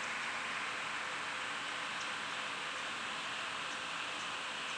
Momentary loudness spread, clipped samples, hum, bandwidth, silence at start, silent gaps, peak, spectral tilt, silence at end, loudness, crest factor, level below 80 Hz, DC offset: 1 LU; under 0.1%; none; 11 kHz; 0 s; none; -26 dBFS; -0.5 dB/octave; 0 s; -38 LUFS; 14 dB; -78 dBFS; under 0.1%